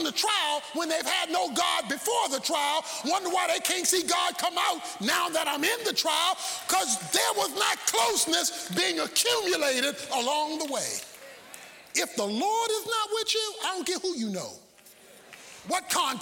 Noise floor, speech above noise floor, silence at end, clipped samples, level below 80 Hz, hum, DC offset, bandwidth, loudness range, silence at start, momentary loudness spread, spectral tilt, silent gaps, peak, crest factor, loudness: -54 dBFS; 26 dB; 0 s; under 0.1%; -72 dBFS; none; under 0.1%; 17 kHz; 4 LU; 0 s; 8 LU; -1 dB/octave; none; -10 dBFS; 18 dB; -26 LUFS